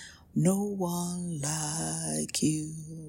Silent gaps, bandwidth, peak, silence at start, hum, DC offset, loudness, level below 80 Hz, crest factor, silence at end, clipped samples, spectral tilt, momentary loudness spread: none; 16.5 kHz; -12 dBFS; 0 s; none; under 0.1%; -30 LUFS; -62 dBFS; 20 dB; 0 s; under 0.1%; -4.5 dB/octave; 7 LU